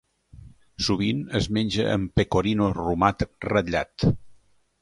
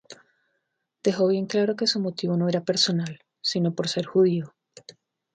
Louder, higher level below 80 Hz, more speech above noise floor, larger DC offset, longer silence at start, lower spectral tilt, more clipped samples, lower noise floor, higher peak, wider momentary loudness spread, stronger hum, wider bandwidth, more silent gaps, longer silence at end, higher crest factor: about the same, -24 LUFS vs -24 LUFS; first, -42 dBFS vs -70 dBFS; second, 32 dB vs 54 dB; neither; first, 0.35 s vs 0.1 s; about the same, -6 dB/octave vs -5 dB/octave; neither; second, -56 dBFS vs -77 dBFS; first, -4 dBFS vs -8 dBFS; second, 5 LU vs 8 LU; neither; first, 11.5 kHz vs 9.4 kHz; neither; about the same, 0.5 s vs 0.45 s; first, 22 dB vs 16 dB